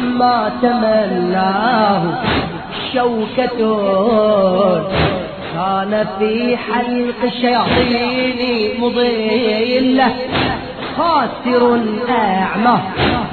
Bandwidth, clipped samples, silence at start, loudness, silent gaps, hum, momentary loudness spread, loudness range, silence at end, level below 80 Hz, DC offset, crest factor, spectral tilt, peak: 4.6 kHz; under 0.1%; 0 s; -15 LUFS; none; none; 5 LU; 1 LU; 0 s; -40 dBFS; 0.2%; 14 dB; -8.5 dB/octave; 0 dBFS